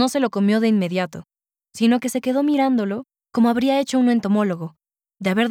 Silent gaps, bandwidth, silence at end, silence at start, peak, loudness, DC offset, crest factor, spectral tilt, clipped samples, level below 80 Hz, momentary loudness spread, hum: none; 15.5 kHz; 0 s; 0 s; -6 dBFS; -20 LUFS; under 0.1%; 14 dB; -5.5 dB/octave; under 0.1%; -66 dBFS; 11 LU; none